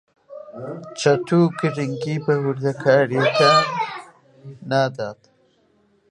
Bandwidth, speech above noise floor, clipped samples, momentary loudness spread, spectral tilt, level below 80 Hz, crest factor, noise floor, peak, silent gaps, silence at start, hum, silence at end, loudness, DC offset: 11.5 kHz; 41 dB; under 0.1%; 19 LU; -5.5 dB/octave; -68 dBFS; 18 dB; -61 dBFS; -2 dBFS; none; 0.3 s; none; 0.95 s; -19 LUFS; under 0.1%